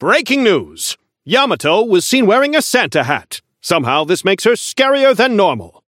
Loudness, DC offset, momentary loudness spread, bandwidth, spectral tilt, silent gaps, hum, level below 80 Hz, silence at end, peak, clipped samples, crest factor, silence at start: -13 LUFS; under 0.1%; 10 LU; 17 kHz; -3.5 dB/octave; none; none; -60 dBFS; 0.2 s; 0 dBFS; under 0.1%; 14 dB; 0 s